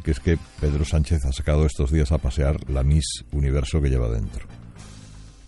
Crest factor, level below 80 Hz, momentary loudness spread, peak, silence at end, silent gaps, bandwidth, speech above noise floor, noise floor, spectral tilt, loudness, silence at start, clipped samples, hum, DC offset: 16 dB; -26 dBFS; 21 LU; -6 dBFS; 0.05 s; none; 11.5 kHz; 21 dB; -43 dBFS; -6.5 dB/octave; -23 LUFS; 0 s; under 0.1%; none; under 0.1%